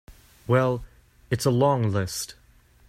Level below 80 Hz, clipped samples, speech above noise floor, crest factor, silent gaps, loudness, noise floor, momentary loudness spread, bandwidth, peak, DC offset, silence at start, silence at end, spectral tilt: -52 dBFS; under 0.1%; 34 dB; 18 dB; none; -24 LUFS; -56 dBFS; 12 LU; 15.5 kHz; -8 dBFS; under 0.1%; 0.1 s; 0.55 s; -6 dB/octave